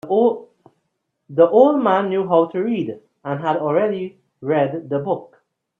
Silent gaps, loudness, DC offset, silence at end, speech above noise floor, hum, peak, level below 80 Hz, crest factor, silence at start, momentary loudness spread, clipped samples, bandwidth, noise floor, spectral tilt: none; -19 LUFS; under 0.1%; 0.55 s; 56 dB; none; -2 dBFS; -68 dBFS; 18 dB; 0.05 s; 15 LU; under 0.1%; 3.9 kHz; -73 dBFS; -9 dB/octave